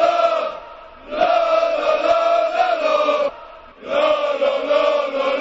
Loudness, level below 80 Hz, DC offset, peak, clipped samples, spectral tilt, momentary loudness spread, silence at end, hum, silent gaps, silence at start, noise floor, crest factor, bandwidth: -18 LUFS; -54 dBFS; under 0.1%; -4 dBFS; under 0.1%; -3 dB/octave; 12 LU; 0 s; none; none; 0 s; -39 dBFS; 14 dB; 8 kHz